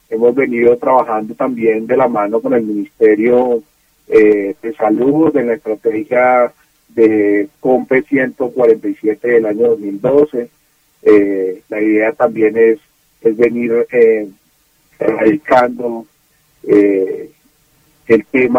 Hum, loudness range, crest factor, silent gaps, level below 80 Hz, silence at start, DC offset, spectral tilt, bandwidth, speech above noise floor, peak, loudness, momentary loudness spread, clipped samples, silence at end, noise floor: none; 2 LU; 14 dB; none; -54 dBFS; 0.1 s; under 0.1%; -8 dB/octave; 6 kHz; 43 dB; 0 dBFS; -13 LUFS; 9 LU; under 0.1%; 0 s; -56 dBFS